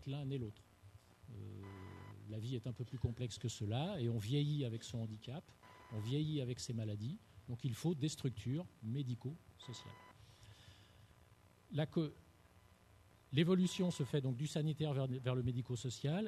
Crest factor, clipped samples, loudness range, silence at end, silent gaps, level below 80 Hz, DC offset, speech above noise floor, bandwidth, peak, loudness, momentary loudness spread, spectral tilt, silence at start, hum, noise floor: 22 dB; under 0.1%; 9 LU; 0 s; none; -68 dBFS; under 0.1%; 26 dB; 13 kHz; -20 dBFS; -41 LUFS; 17 LU; -6.5 dB/octave; 0 s; none; -67 dBFS